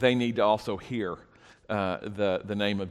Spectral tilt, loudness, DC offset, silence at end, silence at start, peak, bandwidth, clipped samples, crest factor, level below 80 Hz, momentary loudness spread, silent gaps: -6.5 dB/octave; -29 LUFS; under 0.1%; 0 s; 0 s; -8 dBFS; 13 kHz; under 0.1%; 20 dB; -60 dBFS; 9 LU; none